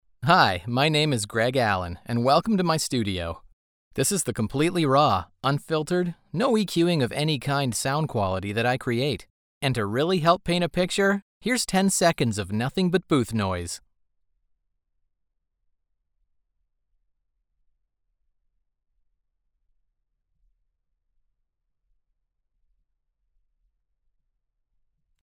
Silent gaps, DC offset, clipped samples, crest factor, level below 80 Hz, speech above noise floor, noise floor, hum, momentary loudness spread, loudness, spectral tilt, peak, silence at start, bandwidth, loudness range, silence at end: 3.53-3.91 s, 9.30-9.61 s, 11.22-11.41 s; under 0.1%; under 0.1%; 24 dB; -54 dBFS; 54 dB; -77 dBFS; none; 8 LU; -24 LUFS; -4.5 dB/octave; -4 dBFS; 0.2 s; over 20 kHz; 5 LU; 11.45 s